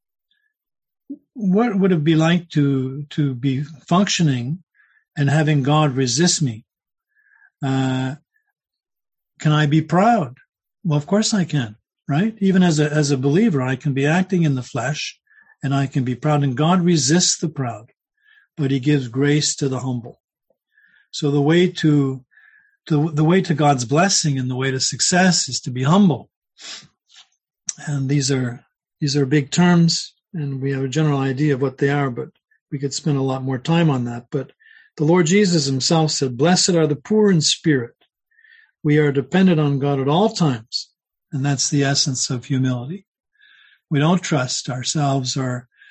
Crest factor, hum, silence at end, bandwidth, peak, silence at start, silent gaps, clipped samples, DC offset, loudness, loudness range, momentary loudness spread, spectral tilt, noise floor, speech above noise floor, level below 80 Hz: 16 dB; none; 0.3 s; 9.2 kHz; -2 dBFS; 1.1 s; 4.63-4.67 s, 20.20-20.28 s, 26.36-26.41 s, 32.61-32.66 s, 43.07-43.12 s; under 0.1%; under 0.1%; -19 LUFS; 4 LU; 13 LU; -5 dB/octave; -69 dBFS; 51 dB; -60 dBFS